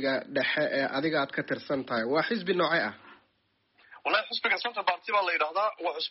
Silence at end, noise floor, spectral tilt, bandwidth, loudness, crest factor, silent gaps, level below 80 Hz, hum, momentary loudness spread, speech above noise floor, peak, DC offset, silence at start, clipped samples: 0 s; -73 dBFS; -1.5 dB/octave; 6 kHz; -28 LUFS; 16 dB; none; -76 dBFS; none; 5 LU; 44 dB; -12 dBFS; under 0.1%; 0 s; under 0.1%